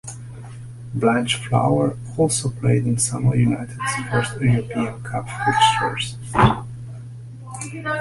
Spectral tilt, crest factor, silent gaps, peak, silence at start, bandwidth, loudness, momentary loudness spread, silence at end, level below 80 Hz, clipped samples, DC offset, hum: -5 dB/octave; 18 dB; none; -2 dBFS; 0.05 s; 11.5 kHz; -20 LUFS; 18 LU; 0 s; -44 dBFS; under 0.1%; under 0.1%; none